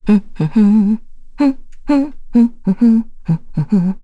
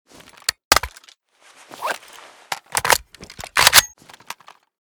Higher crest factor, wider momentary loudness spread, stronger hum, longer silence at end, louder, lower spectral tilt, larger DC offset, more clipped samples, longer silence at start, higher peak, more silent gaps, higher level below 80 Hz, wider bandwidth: second, 12 dB vs 22 dB; second, 8 LU vs 25 LU; neither; second, 0.05 s vs 0.95 s; about the same, -15 LUFS vs -17 LUFS; first, -9.5 dB/octave vs 0.5 dB/octave; neither; neither; second, 0 s vs 0.5 s; about the same, -2 dBFS vs 0 dBFS; second, none vs 0.65-0.71 s; first, -34 dBFS vs -46 dBFS; second, 7.6 kHz vs over 20 kHz